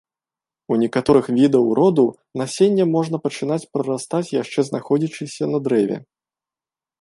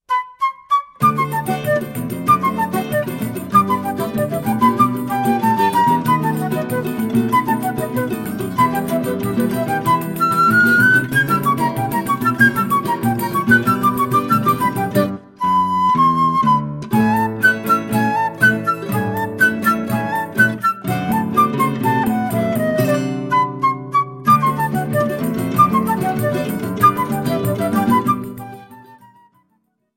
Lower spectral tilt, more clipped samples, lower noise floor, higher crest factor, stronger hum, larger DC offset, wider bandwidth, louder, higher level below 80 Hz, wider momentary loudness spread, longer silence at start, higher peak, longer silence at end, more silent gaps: about the same, -6.5 dB/octave vs -6 dB/octave; neither; first, under -90 dBFS vs -65 dBFS; about the same, 18 dB vs 16 dB; neither; neither; second, 11.5 kHz vs 16.5 kHz; about the same, -19 LUFS vs -17 LUFS; about the same, -56 dBFS vs -52 dBFS; about the same, 9 LU vs 7 LU; first, 0.7 s vs 0.1 s; about the same, -2 dBFS vs 0 dBFS; about the same, 1 s vs 1 s; neither